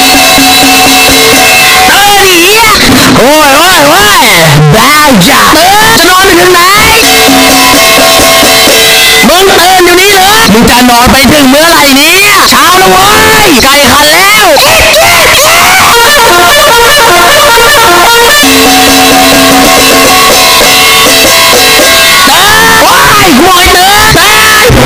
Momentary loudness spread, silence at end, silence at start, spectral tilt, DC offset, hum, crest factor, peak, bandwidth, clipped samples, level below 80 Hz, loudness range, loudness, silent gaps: 1 LU; 0 s; 0 s; -2 dB/octave; under 0.1%; none; 2 dB; 0 dBFS; over 20 kHz; 10%; -24 dBFS; 0 LU; 0 LUFS; none